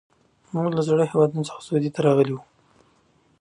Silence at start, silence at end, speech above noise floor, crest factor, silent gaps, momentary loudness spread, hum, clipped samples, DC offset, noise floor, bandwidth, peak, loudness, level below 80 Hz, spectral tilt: 0.55 s; 1 s; 40 dB; 18 dB; none; 10 LU; none; under 0.1%; under 0.1%; -62 dBFS; 11 kHz; -6 dBFS; -22 LUFS; -66 dBFS; -7.5 dB/octave